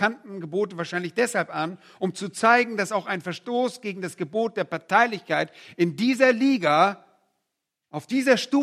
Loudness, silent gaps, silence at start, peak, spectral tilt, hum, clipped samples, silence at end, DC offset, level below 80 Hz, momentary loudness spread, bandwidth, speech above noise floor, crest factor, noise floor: -24 LUFS; none; 0 s; -4 dBFS; -4.5 dB/octave; none; under 0.1%; 0 s; under 0.1%; -78 dBFS; 13 LU; 14.5 kHz; 58 dB; 20 dB; -82 dBFS